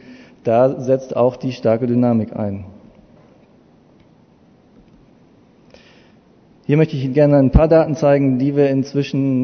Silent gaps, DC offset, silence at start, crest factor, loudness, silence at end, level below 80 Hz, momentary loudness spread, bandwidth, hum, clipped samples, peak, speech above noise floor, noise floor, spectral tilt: none; under 0.1%; 0.1 s; 18 dB; -16 LUFS; 0 s; -32 dBFS; 11 LU; 6.6 kHz; none; under 0.1%; 0 dBFS; 36 dB; -51 dBFS; -8.5 dB/octave